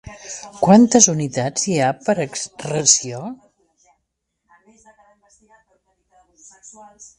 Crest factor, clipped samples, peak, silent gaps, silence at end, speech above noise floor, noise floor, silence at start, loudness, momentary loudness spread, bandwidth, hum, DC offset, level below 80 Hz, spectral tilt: 20 dB; under 0.1%; 0 dBFS; none; 0.15 s; 58 dB; -75 dBFS; 0.05 s; -16 LUFS; 21 LU; 11.5 kHz; none; under 0.1%; -58 dBFS; -3.5 dB/octave